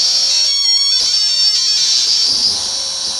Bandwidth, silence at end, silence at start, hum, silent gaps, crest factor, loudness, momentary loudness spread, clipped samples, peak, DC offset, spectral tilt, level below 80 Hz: 16 kHz; 0 s; 0 s; none; none; 12 dB; -11 LUFS; 4 LU; under 0.1%; -2 dBFS; under 0.1%; 2.5 dB/octave; -52 dBFS